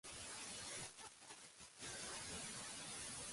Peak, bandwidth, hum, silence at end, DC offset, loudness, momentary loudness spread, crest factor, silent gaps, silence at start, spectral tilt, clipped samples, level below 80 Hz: -36 dBFS; 11.5 kHz; none; 0 s; under 0.1%; -50 LUFS; 9 LU; 16 dB; none; 0.05 s; -1 dB/octave; under 0.1%; -72 dBFS